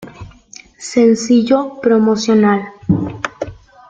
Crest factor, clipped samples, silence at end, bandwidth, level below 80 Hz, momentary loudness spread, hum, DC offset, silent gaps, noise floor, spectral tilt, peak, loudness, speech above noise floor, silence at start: 14 dB; under 0.1%; 0.35 s; 9.2 kHz; -46 dBFS; 16 LU; none; under 0.1%; none; -41 dBFS; -6 dB/octave; -2 dBFS; -14 LUFS; 28 dB; 0 s